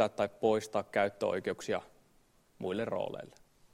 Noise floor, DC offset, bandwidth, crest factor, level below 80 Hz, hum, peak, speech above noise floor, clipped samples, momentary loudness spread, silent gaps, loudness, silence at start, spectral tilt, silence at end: -67 dBFS; under 0.1%; 16 kHz; 20 dB; -70 dBFS; none; -14 dBFS; 34 dB; under 0.1%; 10 LU; none; -34 LUFS; 0 s; -5 dB/octave; 0.45 s